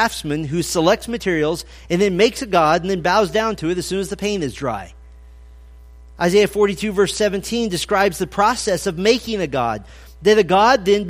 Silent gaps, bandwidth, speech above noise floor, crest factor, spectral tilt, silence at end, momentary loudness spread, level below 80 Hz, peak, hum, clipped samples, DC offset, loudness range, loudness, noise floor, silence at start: none; 15.5 kHz; 23 dB; 16 dB; -4.5 dB/octave; 0 s; 9 LU; -42 dBFS; -2 dBFS; none; under 0.1%; under 0.1%; 4 LU; -18 LUFS; -41 dBFS; 0 s